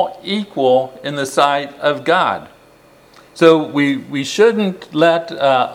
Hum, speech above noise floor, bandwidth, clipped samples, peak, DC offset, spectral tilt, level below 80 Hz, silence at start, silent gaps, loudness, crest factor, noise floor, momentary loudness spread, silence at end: none; 32 dB; 15 kHz; under 0.1%; 0 dBFS; under 0.1%; -5 dB/octave; -62 dBFS; 0 s; none; -15 LUFS; 16 dB; -47 dBFS; 9 LU; 0 s